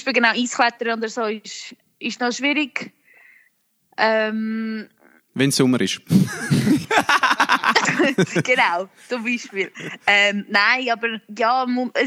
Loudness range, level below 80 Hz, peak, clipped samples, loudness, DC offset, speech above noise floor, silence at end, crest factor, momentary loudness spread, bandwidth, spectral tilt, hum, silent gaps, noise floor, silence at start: 6 LU; -64 dBFS; -2 dBFS; under 0.1%; -19 LUFS; under 0.1%; 43 dB; 0 s; 18 dB; 13 LU; 16 kHz; -4 dB/octave; none; none; -64 dBFS; 0 s